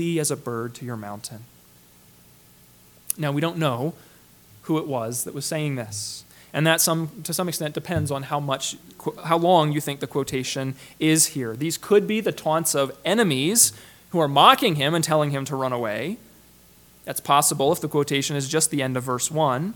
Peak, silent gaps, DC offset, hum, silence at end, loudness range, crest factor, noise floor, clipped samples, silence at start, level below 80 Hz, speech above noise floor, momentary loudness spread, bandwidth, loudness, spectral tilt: 0 dBFS; none; under 0.1%; none; 0 s; 10 LU; 24 dB; -53 dBFS; under 0.1%; 0 s; -62 dBFS; 30 dB; 14 LU; 19 kHz; -22 LUFS; -3.5 dB/octave